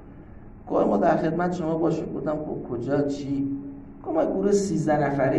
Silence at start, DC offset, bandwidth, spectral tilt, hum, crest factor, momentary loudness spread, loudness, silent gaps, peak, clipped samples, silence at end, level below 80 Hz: 0 s; under 0.1%; 11.5 kHz; -7 dB/octave; none; 16 dB; 9 LU; -25 LUFS; none; -8 dBFS; under 0.1%; 0 s; -50 dBFS